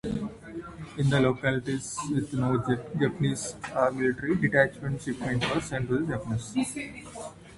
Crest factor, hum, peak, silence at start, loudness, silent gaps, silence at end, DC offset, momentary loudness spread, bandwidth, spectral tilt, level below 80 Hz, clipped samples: 20 dB; none; -8 dBFS; 0.05 s; -28 LUFS; none; 0 s; under 0.1%; 15 LU; 11.5 kHz; -5.5 dB/octave; -52 dBFS; under 0.1%